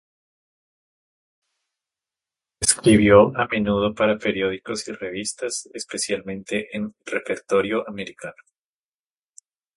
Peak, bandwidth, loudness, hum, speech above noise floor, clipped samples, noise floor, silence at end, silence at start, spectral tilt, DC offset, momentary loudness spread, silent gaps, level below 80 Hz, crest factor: 0 dBFS; 11.5 kHz; -21 LUFS; none; over 68 dB; under 0.1%; under -90 dBFS; 1.5 s; 2.6 s; -4 dB/octave; under 0.1%; 16 LU; none; -50 dBFS; 24 dB